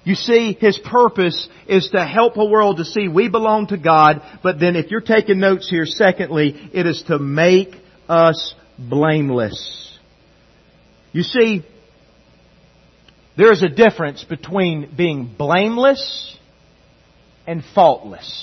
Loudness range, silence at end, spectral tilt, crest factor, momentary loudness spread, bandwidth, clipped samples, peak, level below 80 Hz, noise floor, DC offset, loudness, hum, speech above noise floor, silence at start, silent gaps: 6 LU; 0 s; -6.5 dB/octave; 16 dB; 13 LU; 6.4 kHz; under 0.1%; 0 dBFS; -56 dBFS; -52 dBFS; under 0.1%; -16 LUFS; none; 36 dB; 0.05 s; none